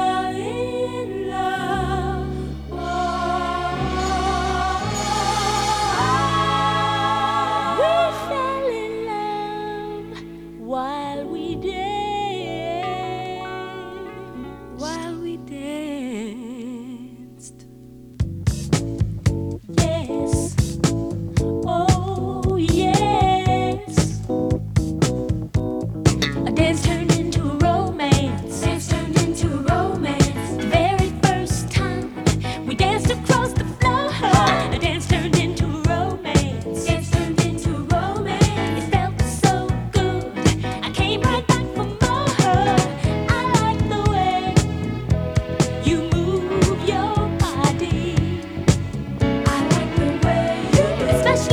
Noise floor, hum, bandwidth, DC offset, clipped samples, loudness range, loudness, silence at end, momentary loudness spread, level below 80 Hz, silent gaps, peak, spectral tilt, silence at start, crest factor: -42 dBFS; none; 17.5 kHz; under 0.1%; under 0.1%; 8 LU; -21 LUFS; 0 s; 10 LU; -32 dBFS; none; 0 dBFS; -5.5 dB/octave; 0 s; 20 dB